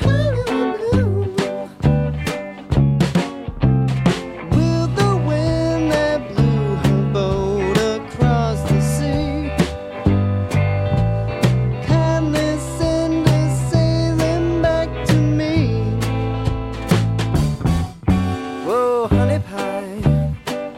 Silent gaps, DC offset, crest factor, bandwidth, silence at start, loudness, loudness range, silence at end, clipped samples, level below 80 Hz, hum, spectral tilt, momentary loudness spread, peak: none; under 0.1%; 16 dB; 13.5 kHz; 0 s; -19 LUFS; 2 LU; 0 s; under 0.1%; -30 dBFS; none; -7 dB/octave; 5 LU; -2 dBFS